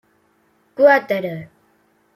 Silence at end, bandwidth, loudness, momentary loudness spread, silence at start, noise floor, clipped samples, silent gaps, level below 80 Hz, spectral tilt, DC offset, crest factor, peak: 0.7 s; 14.5 kHz; -16 LUFS; 21 LU; 0.8 s; -61 dBFS; under 0.1%; none; -70 dBFS; -6.5 dB/octave; under 0.1%; 18 dB; -2 dBFS